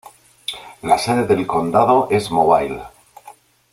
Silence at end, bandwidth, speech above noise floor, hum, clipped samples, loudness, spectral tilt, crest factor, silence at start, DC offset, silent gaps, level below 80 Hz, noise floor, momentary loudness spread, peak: 0.4 s; 15.5 kHz; 29 dB; none; under 0.1%; -17 LUFS; -5.5 dB/octave; 18 dB; 0.5 s; under 0.1%; none; -52 dBFS; -45 dBFS; 15 LU; 0 dBFS